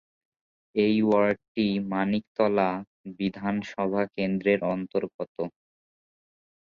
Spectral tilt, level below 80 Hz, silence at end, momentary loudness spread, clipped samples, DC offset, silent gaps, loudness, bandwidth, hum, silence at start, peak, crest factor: -8 dB/octave; -64 dBFS; 1.15 s; 11 LU; under 0.1%; under 0.1%; 1.48-1.55 s, 2.27-2.35 s, 2.87-3.04 s, 5.14-5.19 s, 5.28-5.35 s; -27 LUFS; 7 kHz; none; 0.75 s; -10 dBFS; 18 dB